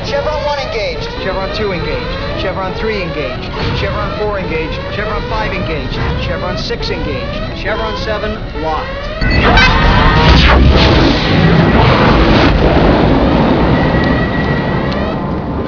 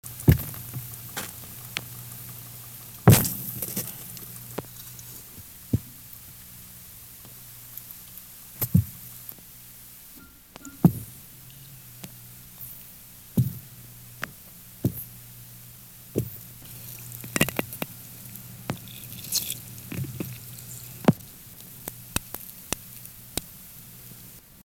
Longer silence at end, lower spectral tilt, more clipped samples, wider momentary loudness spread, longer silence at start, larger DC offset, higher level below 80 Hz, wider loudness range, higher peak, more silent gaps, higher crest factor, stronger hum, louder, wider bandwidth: about the same, 0 s vs 0 s; first, -6.5 dB/octave vs -5 dB/octave; first, 0.2% vs under 0.1%; second, 11 LU vs 19 LU; about the same, 0 s vs 0.05 s; first, 1% vs under 0.1%; first, -18 dBFS vs -48 dBFS; about the same, 9 LU vs 10 LU; about the same, 0 dBFS vs -2 dBFS; neither; second, 12 dB vs 28 dB; second, none vs 60 Hz at -55 dBFS; first, -13 LUFS vs -29 LUFS; second, 5.4 kHz vs 18 kHz